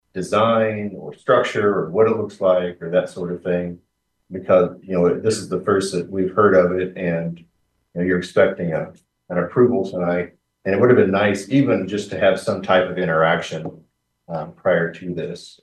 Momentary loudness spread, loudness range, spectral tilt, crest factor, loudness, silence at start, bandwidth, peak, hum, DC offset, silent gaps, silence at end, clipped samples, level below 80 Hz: 13 LU; 3 LU; -6 dB/octave; 18 dB; -19 LUFS; 0.15 s; 12 kHz; -2 dBFS; none; under 0.1%; none; 0.15 s; under 0.1%; -58 dBFS